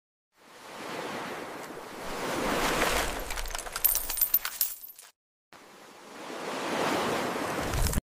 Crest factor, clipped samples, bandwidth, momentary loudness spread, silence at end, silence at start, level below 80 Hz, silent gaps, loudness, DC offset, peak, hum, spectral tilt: 24 dB; under 0.1%; 16 kHz; 20 LU; 0.05 s; 0.45 s; -42 dBFS; 5.16-5.52 s; -29 LUFS; under 0.1%; -8 dBFS; none; -3 dB/octave